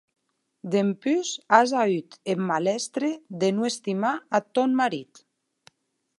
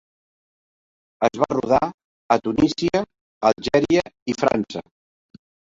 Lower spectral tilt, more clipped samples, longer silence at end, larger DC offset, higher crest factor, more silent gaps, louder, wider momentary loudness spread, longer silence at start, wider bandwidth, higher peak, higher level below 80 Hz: about the same, -4.5 dB/octave vs -5.5 dB/octave; neither; first, 1.15 s vs 0.95 s; neither; about the same, 24 dB vs 20 dB; second, none vs 1.94-1.98 s, 2.04-2.29 s, 3.21-3.41 s, 4.22-4.26 s; second, -25 LUFS vs -21 LUFS; about the same, 9 LU vs 10 LU; second, 0.65 s vs 1.2 s; first, 11.5 kHz vs 7.8 kHz; about the same, -2 dBFS vs -2 dBFS; second, -80 dBFS vs -50 dBFS